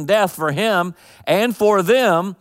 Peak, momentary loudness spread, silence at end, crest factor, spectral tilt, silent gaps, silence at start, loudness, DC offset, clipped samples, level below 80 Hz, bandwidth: -4 dBFS; 6 LU; 0.05 s; 14 dB; -5 dB/octave; none; 0 s; -17 LUFS; under 0.1%; under 0.1%; -62 dBFS; 16 kHz